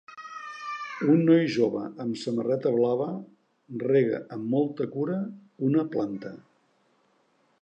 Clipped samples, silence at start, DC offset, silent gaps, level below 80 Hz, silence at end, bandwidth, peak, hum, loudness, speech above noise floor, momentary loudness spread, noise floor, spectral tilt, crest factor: under 0.1%; 0.1 s; under 0.1%; none; -78 dBFS; 1.2 s; 8.8 kHz; -10 dBFS; none; -27 LUFS; 42 dB; 17 LU; -67 dBFS; -8 dB/octave; 18 dB